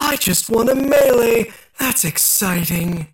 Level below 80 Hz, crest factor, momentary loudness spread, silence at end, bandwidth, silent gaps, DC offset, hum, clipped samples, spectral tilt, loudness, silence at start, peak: -44 dBFS; 10 dB; 7 LU; 0.1 s; 17 kHz; none; under 0.1%; none; under 0.1%; -3.5 dB/octave; -15 LUFS; 0 s; -6 dBFS